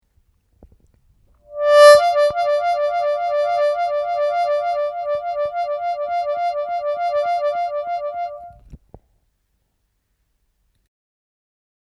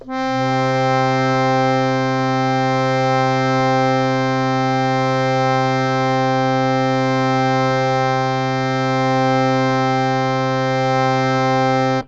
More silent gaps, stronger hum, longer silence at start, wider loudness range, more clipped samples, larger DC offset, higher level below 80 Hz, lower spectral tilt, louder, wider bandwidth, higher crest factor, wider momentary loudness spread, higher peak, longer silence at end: neither; neither; first, 1.5 s vs 0.05 s; first, 13 LU vs 1 LU; neither; neither; second, -56 dBFS vs -48 dBFS; second, -1 dB/octave vs -6.5 dB/octave; about the same, -18 LUFS vs -17 LUFS; first, 12.5 kHz vs 7.8 kHz; first, 20 dB vs 14 dB; first, 13 LU vs 2 LU; first, 0 dBFS vs -4 dBFS; first, 3.2 s vs 0 s